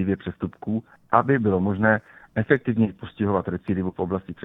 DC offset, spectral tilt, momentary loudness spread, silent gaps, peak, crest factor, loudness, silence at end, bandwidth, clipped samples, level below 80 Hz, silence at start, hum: under 0.1%; -10.5 dB/octave; 9 LU; none; -2 dBFS; 22 dB; -24 LUFS; 0 s; 4 kHz; under 0.1%; -54 dBFS; 0 s; none